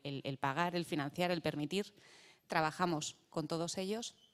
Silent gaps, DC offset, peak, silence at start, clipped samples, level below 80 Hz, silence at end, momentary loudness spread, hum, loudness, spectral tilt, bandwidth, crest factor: none; under 0.1%; -16 dBFS; 0.05 s; under 0.1%; -74 dBFS; 0.2 s; 7 LU; none; -38 LUFS; -4.5 dB/octave; 14.5 kHz; 22 dB